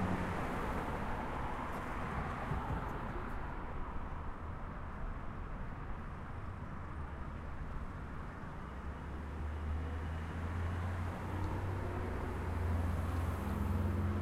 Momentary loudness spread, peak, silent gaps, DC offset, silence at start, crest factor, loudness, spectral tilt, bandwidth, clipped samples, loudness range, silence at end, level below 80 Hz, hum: 9 LU; -24 dBFS; none; under 0.1%; 0 s; 14 dB; -41 LUFS; -7.5 dB/octave; 14.5 kHz; under 0.1%; 7 LU; 0 s; -46 dBFS; none